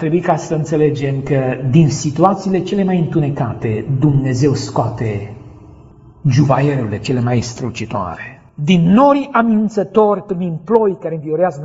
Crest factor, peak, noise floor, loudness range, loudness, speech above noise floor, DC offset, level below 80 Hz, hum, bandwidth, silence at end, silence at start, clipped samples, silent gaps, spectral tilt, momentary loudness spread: 16 dB; 0 dBFS; -41 dBFS; 4 LU; -16 LUFS; 27 dB; under 0.1%; -44 dBFS; none; 8 kHz; 0 s; 0 s; under 0.1%; none; -7.5 dB/octave; 10 LU